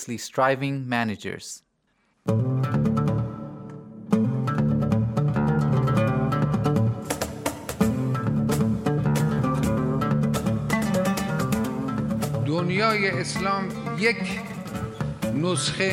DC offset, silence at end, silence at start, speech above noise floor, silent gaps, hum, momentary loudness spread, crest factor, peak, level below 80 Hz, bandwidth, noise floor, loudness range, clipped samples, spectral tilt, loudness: under 0.1%; 0 s; 0 s; 44 dB; none; none; 9 LU; 16 dB; -8 dBFS; -48 dBFS; 16 kHz; -69 dBFS; 3 LU; under 0.1%; -6 dB/octave; -24 LUFS